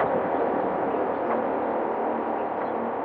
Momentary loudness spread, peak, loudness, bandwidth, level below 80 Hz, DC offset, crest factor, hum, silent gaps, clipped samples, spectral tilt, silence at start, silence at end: 3 LU; -12 dBFS; -26 LUFS; 4.8 kHz; -62 dBFS; under 0.1%; 14 dB; none; none; under 0.1%; -5.5 dB/octave; 0 s; 0 s